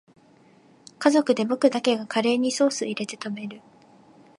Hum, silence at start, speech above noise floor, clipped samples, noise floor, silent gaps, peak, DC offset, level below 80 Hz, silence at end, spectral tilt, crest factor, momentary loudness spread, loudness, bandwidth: none; 1 s; 33 dB; under 0.1%; -56 dBFS; none; -4 dBFS; under 0.1%; -78 dBFS; 0.8 s; -4 dB/octave; 22 dB; 12 LU; -23 LUFS; 11.5 kHz